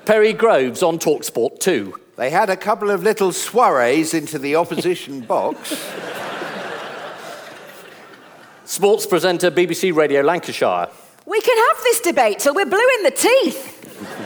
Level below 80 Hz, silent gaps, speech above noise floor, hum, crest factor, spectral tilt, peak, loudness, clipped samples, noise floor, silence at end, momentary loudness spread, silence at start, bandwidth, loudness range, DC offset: -70 dBFS; none; 27 dB; none; 16 dB; -3.5 dB/octave; -2 dBFS; -17 LUFS; under 0.1%; -43 dBFS; 0 s; 16 LU; 0.05 s; over 20 kHz; 9 LU; under 0.1%